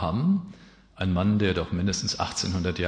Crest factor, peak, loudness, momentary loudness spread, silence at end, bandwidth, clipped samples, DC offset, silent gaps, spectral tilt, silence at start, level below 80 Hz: 16 dB; -10 dBFS; -26 LUFS; 5 LU; 0 s; 9.8 kHz; under 0.1%; under 0.1%; none; -5 dB/octave; 0 s; -46 dBFS